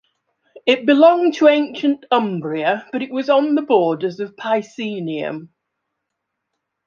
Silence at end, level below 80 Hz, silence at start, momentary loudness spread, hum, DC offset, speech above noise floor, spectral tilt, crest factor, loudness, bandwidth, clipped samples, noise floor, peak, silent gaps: 1.4 s; -72 dBFS; 0.55 s; 13 LU; none; under 0.1%; 61 dB; -6 dB/octave; 16 dB; -18 LUFS; 7.2 kHz; under 0.1%; -78 dBFS; -2 dBFS; none